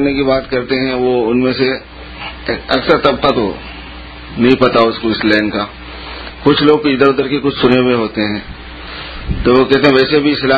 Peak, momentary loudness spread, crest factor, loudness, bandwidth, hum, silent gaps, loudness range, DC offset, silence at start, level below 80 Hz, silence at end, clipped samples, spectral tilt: 0 dBFS; 17 LU; 14 dB; -13 LUFS; 8 kHz; none; none; 2 LU; under 0.1%; 0 s; -32 dBFS; 0 s; 0.1%; -7.5 dB/octave